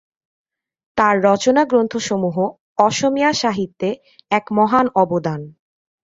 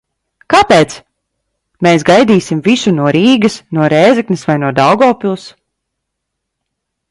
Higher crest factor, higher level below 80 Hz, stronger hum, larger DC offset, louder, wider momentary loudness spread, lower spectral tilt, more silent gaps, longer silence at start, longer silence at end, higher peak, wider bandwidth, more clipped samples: first, 18 dB vs 12 dB; second, -58 dBFS vs -48 dBFS; neither; neither; second, -18 LUFS vs -10 LUFS; about the same, 10 LU vs 8 LU; about the same, -5 dB/octave vs -5.5 dB/octave; first, 2.60-2.75 s vs none; first, 0.95 s vs 0.5 s; second, 0.55 s vs 1.65 s; about the same, 0 dBFS vs 0 dBFS; second, 8 kHz vs 11.5 kHz; neither